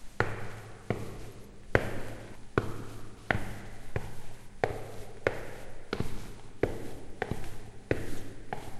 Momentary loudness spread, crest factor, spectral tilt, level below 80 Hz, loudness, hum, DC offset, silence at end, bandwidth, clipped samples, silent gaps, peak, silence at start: 14 LU; 30 dB; -6 dB/octave; -44 dBFS; -37 LUFS; none; 0.1%; 0 s; 13.5 kHz; under 0.1%; none; -4 dBFS; 0 s